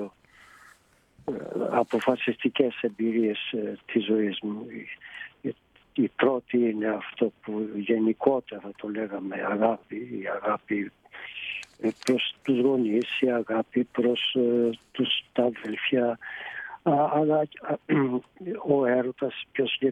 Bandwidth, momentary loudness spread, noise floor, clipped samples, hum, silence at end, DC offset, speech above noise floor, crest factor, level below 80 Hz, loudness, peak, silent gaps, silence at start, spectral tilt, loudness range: 11.5 kHz; 12 LU; -60 dBFS; under 0.1%; none; 0 s; under 0.1%; 33 dB; 20 dB; -70 dBFS; -27 LUFS; -8 dBFS; none; 0 s; -6 dB/octave; 4 LU